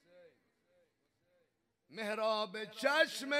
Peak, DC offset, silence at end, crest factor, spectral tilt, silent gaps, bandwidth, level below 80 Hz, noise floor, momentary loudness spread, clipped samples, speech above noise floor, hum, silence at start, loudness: -16 dBFS; under 0.1%; 0 s; 22 dB; -2.5 dB/octave; none; 16 kHz; under -90 dBFS; -80 dBFS; 12 LU; under 0.1%; 45 dB; none; 0.15 s; -35 LUFS